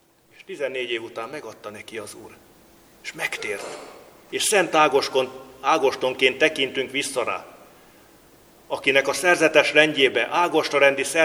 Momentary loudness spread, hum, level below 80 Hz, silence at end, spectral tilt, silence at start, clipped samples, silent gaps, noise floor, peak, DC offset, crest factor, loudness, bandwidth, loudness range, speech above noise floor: 19 LU; none; -68 dBFS; 0 s; -2 dB/octave; 0.5 s; under 0.1%; none; -52 dBFS; 0 dBFS; under 0.1%; 24 dB; -21 LUFS; over 20 kHz; 12 LU; 30 dB